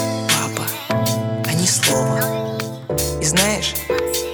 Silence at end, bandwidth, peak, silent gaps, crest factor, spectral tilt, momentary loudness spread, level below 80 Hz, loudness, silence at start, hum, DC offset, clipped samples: 0 s; over 20 kHz; -2 dBFS; none; 18 dB; -3.5 dB/octave; 8 LU; -40 dBFS; -19 LUFS; 0 s; none; under 0.1%; under 0.1%